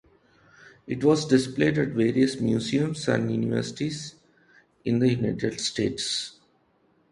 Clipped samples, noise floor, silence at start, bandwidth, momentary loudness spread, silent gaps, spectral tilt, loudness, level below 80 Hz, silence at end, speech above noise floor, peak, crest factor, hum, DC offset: under 0.1%; -65 dBFS; 0.85 s; 11.5 kHz; 9 LU; none; -5.5 dB/octave; -25 LUFS; -56 dBFS; 0.8 s; 41 dB; -6 dBFS; 20 dB; none; under 0.1%